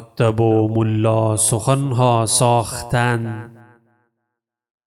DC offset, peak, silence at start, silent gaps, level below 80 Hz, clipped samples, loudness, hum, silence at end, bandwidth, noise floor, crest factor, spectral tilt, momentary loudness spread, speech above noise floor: under 0.1%; -2 dBFS; 0 s; none; -48 dBFS; under 0.1%; -17 LUFS; none; 1.35 s; 15 kHz; -79 dBFS; 16 dB; -5 dB/octave; 6 LU; 63 dB